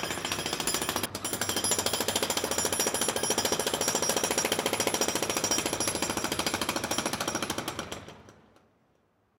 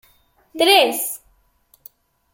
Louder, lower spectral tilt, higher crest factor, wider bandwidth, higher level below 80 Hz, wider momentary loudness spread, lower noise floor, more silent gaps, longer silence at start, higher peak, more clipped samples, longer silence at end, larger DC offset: second, -28 LUFS vs -16 LUFS; first, -1.5 dB/octave vs 0 dB/octave; about the same, 20 dB vs 20 dB; about the same, 17 kHz vs 17 kHz; first, -56 dBFS vs -64 dBFS; second, 5 LU vs 21 LU; first, -69 dBFS vs -60 dBFS; neither; second, 0 s vs 0.55 s; second, -10 dBFS vs -2 dBFS; neither; about the same, 1.05 s vs 1.15 s; neither